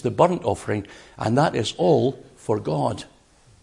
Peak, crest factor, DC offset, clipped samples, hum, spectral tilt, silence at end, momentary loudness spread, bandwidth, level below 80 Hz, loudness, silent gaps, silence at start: -2 dBFS; 20 dB; under 0.1%; under 0.1%; none; -6.5 dB/octave; 0.6 s; 10 LU; 11.5 kHz; -56 dBFS; -23 LUFS; none; 0.05 s